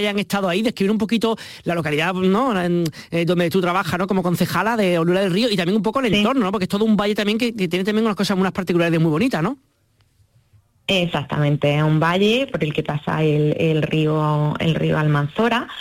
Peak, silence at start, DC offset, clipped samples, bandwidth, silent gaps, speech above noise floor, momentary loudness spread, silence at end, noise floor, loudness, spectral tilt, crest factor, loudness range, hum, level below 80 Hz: -6 dBFS; 0 s; under 0.1%; under 0.1%; 16.5 kHz; none; 42 dB; 5 LU; 0 s; -61 dBFS; -19 LUFS; -6.5 dB/octave; 12 dB; 3 LU; none; -50 dBFS